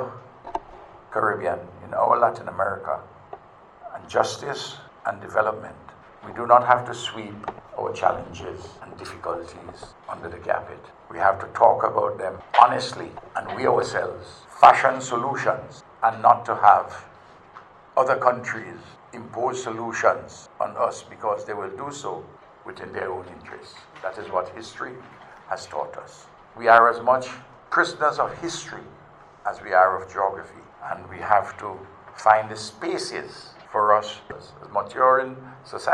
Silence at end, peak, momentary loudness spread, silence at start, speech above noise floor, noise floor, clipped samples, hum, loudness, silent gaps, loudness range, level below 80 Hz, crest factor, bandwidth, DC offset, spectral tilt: 0 s; 0 dBFS; 23 LU; 0 s; 25 dB; -48 dBFS; under 0.1%; none; -23 LUFS; none; 11 LU; -62 dBFS; 24 dB; 11.5 kHz; under 0.1%; -4 dB/octave